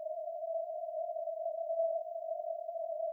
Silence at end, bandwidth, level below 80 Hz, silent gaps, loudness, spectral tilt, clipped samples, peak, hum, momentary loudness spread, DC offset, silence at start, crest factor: 0 s; 0.8 kHz; under -90 dBFS; none; -38 LUFS; -3.5 dB/octave; under 0.1%; -26 dBFS; none; 5 LU; under 0.1%; 0 s; 12 dB